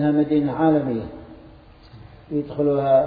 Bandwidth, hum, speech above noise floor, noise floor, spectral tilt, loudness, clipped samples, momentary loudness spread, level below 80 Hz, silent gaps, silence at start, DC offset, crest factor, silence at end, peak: 4.9 kHz; none; 27 dB; -46 dBFS; -11.5 dB/octave; -21 LUFS; under 0.1%; 12 LU; -50 dBFS; none; 0 s; under 0.1%; 16 dB; 0 s; -6 dBFS